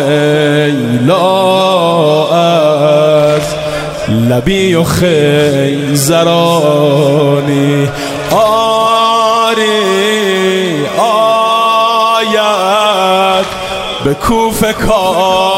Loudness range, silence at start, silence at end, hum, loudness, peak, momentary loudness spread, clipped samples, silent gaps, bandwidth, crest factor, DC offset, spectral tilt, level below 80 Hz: 1 LU; 0 s; 0 s; none; -10 LUFS; 0 dBFS; 5 LU; under 0.1%; none; 16.5 kHz; 10 dB; under 0.1%; -5 dB/octave; -34 dBFS